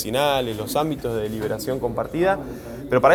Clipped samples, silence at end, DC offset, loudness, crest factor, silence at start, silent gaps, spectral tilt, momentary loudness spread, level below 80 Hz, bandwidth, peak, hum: under 0.1%; 0 s; under 0.1%; -23 LUFS; 20 dB; 0 s; none; -5 dB/octave; 6 LU; -44 dBFS; over 20 kHz; -2 dBFS; none